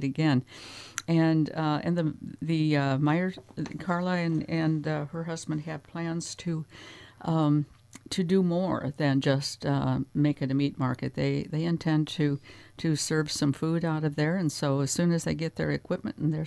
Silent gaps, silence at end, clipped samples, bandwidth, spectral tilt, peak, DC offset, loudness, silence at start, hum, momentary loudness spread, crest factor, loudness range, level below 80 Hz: none; 0 s; under 0.1%; 11 kHz; -6 dB/octave; -10 dBFS; under 0.1%; -28 LUFS; 0 s; none; 10 LU; 18 dB; 4 LU; -60 dBFS